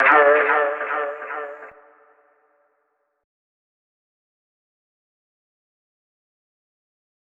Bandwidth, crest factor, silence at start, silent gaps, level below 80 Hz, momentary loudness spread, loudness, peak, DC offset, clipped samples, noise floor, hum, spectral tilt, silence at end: 4.6 kHz; 22 dB; 0 s; none; -76 dBFS; 20 LU; -19 LUFS; -4 dBFS; under 0.1%; under 0.1%; -71 dBFS; none; -5 dB/octave; 5.7 s